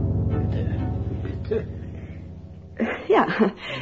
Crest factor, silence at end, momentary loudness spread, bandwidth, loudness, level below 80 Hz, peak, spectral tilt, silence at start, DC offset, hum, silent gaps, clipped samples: 18 dB; 0 s; 18 LU; 7.2 kHz; -25 LUFS; -36 dBFS; -6 dBFS; -8.5 dB/octave; 0 s; 0.1%; none; none; under 0.1%